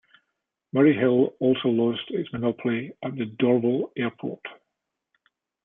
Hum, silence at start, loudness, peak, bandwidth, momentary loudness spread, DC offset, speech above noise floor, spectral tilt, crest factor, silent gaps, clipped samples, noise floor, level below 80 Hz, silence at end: none; 0.75 s; -24 LUFS; -8 dBFS; 3.8 kHz; 13 LU; under 0.1%; 59 dB; -10.5 dB/octave; 18 dB; none; under 0.1%; -82 dBFS; -68 dBFS; 1.1 s